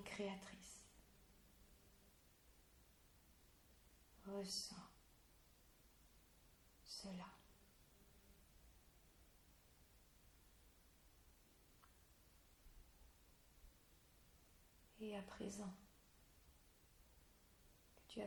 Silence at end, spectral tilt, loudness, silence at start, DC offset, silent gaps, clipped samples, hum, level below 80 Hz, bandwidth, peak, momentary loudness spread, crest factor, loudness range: 0 s; -3.5 dB/octave; -53 LUFS; 0 s; under 0.1%; none; under 0.1%; none; -74 dBFS; over 20 kHz; -36 dBFS; 22 LU; 24 dB; 7 LU